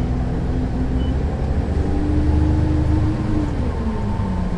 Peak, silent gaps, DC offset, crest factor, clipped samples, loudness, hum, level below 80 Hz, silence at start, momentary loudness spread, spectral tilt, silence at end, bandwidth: -6 dBFS; none; under 0.1%; 12 dB; under 0.1%; -21 LUFS; none; -22 dBFS; 0 s; 5 LU; -9 dB/octave; 0 s; 8.8 kHz